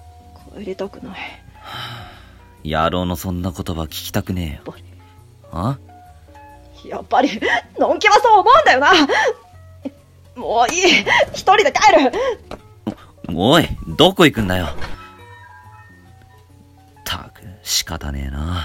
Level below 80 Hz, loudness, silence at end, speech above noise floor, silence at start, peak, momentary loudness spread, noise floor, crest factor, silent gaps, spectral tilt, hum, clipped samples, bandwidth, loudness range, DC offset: -38 dBFS; -16 LUFS; 0 s; 30 dB; 0.05 s; 0 dBFS; 22 LU; -46 dBFS; 18 dB; none; -4 dB/octave; none; under 0.1%; 16.5 kHz; 13 LU; under 0.1%